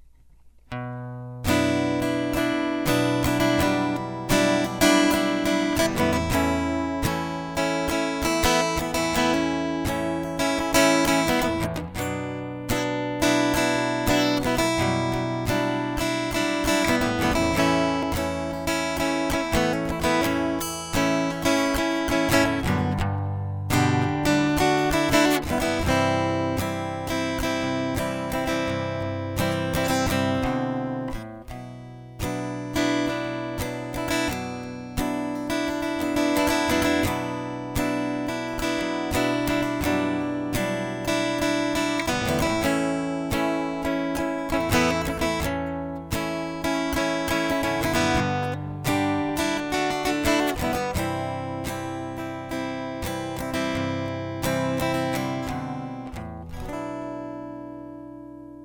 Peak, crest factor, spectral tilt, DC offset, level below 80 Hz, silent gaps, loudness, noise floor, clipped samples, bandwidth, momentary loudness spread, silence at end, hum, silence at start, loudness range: -4 dBFS; 20 dB; -4.5 dB/octave; under 0.1%; -42 dBFS; none; -24 LUFS; -51 dBFS; under 0.1%; over 20 kHz; 10 LU; 0 s; none; 0.45 s; 6 LU